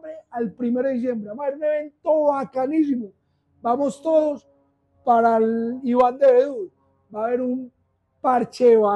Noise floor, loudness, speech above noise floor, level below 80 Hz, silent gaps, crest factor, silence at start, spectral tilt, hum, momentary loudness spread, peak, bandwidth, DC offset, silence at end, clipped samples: -62 dBFS; -21 LUFS; 42 dB; -68 dBFS; none; 14 dB; 0.05 s; -7 dB/octave; none; 14 LU; -6 dBFS; 9.6 kHz; under 0.1%; 0 s; under 0.1%